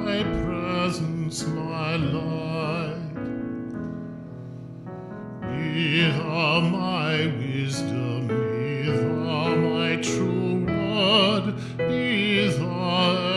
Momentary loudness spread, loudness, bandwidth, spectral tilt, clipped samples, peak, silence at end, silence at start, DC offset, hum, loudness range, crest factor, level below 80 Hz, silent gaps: 13 LU; -24 LUFS; 12 kHz; -5.5 dB/octave; under 0.1%; -6 dBFS; 0 s; 0 s; under 0.1%; none; 7 LU; 18 dB; -50 dBFS; none